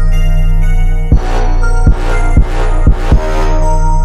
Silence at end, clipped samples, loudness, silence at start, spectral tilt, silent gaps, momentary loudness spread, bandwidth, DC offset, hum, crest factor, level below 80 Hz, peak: 0 s; under 0.1%; -14 LUFS; 0 s; -7 dB/octave; none; 2 LU; 8.4 kHz; under 0.1%; none; 8 dB; -8 dBFS; 0 dBFS